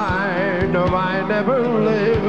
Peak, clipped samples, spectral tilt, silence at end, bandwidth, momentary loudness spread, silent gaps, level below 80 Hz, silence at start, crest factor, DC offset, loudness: -8 dBFS; under 0.1%; -8 dB/octave; 0 s; 8.2 kHz; 2 LU; none; -38 dBFS; 0 s; 10 dB; 0.7%; -19 LUFS